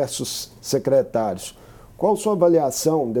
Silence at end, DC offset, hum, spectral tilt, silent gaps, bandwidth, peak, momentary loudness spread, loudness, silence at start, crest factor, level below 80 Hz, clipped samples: 0 s; under 0.1%; none; -5 dB/octave; none; over 20 kHz; -4 dBFS; 11 LU; -21 LUFS; 0 s; 16 dB; -54 dBFS; under 0.1%